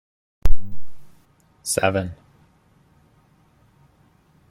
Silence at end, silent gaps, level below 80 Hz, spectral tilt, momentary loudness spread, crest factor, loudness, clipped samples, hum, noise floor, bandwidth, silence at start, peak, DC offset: 2.35 s; none; -30 dBFS; -4 dB/octave; 24 LU; 20 dB; -25 LUFS; under 0.1%; none; -58 dBFS; 14.5 kHz; 0.45 s; 0 dBFS; under 0.1%